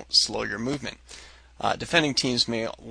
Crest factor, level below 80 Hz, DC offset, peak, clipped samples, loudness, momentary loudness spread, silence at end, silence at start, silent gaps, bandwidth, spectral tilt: 22 dB; -52 dBFS; under 0.1%; -4 dBFS; under 0.1%; -25 LUFS; 20 LU; 0 s; 0 s; none; 10.5 kHz; -3 dB/octave